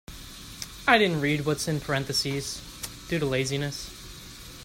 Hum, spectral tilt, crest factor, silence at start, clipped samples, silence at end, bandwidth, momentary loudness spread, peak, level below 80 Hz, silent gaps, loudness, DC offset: none; -4 dB/octave; 22 dB; 0.1 s; under 0.1%; 0 s; 16.5 kHz; 21 LU; -6 dBFS; -50 dBFS; none; -26 LUFS; under 0.1%